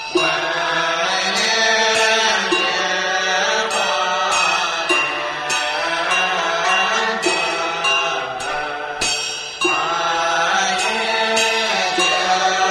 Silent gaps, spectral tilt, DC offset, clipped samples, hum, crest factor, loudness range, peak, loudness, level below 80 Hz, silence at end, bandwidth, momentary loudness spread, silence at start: none; -1 dB/octave; under 0.1%; under 0.1%; none; 16 dB; 3 LU; -4 dBFS; -17 LUFS; -54 dBFS; 0 s; 14.5 kHz; 6 LU; 0 s